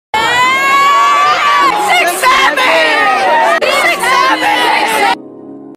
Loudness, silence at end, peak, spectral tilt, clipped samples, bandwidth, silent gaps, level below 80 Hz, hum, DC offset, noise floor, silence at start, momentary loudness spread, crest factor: -9 LUFS; 0 s; 0 dBFS; -1 dB/octave; under 0.1%; 16 kHz; none; -50 dBFS; none; under 0.1%; -30 dBFS; 0.15 s; 2 LU; 10 dB